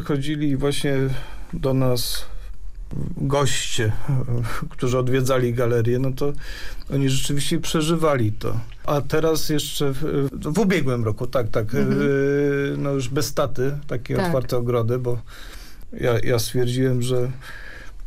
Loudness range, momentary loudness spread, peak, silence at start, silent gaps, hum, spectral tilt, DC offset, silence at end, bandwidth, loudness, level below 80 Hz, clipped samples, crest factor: 3 LU; 14 LU; -10 dBFS; 0 s; none; none; -5.5 dB/octave; under 0.1%; 0 s; 15.5 kHz; -23 LUFS; -36 dBFS; under 0.1%; 12 dB